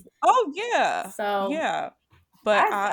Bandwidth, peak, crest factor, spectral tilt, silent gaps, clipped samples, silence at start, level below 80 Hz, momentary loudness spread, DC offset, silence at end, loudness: 19 kHz; -6 dBFS; 20 dB; -3 dB/octave; none; under 0.1%; 0.2 s; -72 dBFS; 10 LU; under 0.1%; 0 s; -24 LUFS